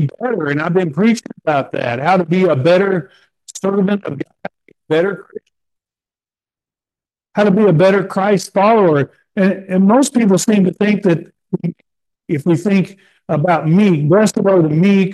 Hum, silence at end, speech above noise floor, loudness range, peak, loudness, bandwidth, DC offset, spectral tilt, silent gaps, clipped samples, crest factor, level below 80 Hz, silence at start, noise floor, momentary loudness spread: none; 0 s; over 76 dB; 8 LU; -2 dBFS; -14 LUFS; 12.5 kHz; under 0.1%; -6.5 dB/octave; none; under 0.1%; 12 dB; -62 dBFS; 0 s; under -90 dBFS; 11 LU